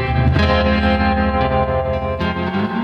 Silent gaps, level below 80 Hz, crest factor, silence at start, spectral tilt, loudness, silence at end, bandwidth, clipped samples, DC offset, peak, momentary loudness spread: none; -24 dBFS; 14 dB; 0 s; -8 dB/octave; -17 LUFS; 0 s; 6.2 kHz; under 0.1%; under 0.1%; -2 dBFS; 5 LU